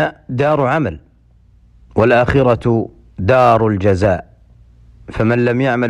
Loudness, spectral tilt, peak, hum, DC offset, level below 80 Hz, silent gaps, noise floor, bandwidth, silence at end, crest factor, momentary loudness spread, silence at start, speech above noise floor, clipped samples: -15 LUFS; -8 dB/octave; -2 dBFS; none; under 0.1%; -38 dBFS; none; -49 dBFS; 10 kHz; 0 s; 12 dB; 11 LU; 0 s; 35 dB; under 0.1%